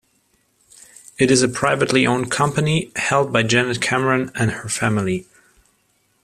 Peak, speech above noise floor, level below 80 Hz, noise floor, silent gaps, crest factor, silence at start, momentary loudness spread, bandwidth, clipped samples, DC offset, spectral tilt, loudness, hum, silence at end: -2 dBFS; 45 dB; -52 dBFS; -64 dBFS; none; 18 dB; 1.2 s; 6 LU; 14.5 kHz; under 0.1%; under 0.1%; -4.5 dB/octave; -18 LUFS; none; 1 s